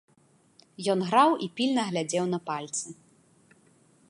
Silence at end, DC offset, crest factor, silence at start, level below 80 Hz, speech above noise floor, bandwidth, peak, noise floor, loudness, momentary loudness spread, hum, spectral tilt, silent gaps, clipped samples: 1.15 s; under 0.1%; 22 dB; 0.8 s; -78 dBFS; 37 dB; 11.5 kHz; -8 dBFS; -63 dBFS; -27 LUFS; 12 LU; none; -4.5 dB/octave; none; under 0.1%